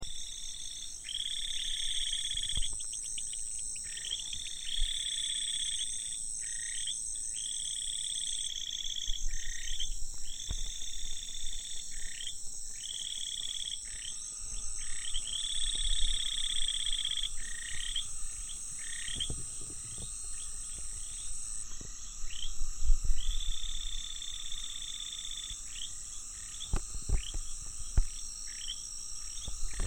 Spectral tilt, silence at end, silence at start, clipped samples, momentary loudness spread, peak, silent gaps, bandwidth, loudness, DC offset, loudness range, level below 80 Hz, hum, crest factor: 0 dB/octave; 0 s; 0 s; under 0.1%; 8 LU; -12 dBFS; none; 16.5 kHz; -36 LUFS; under 0.1%; 6 LU; -38 dBFS; none; 22 dB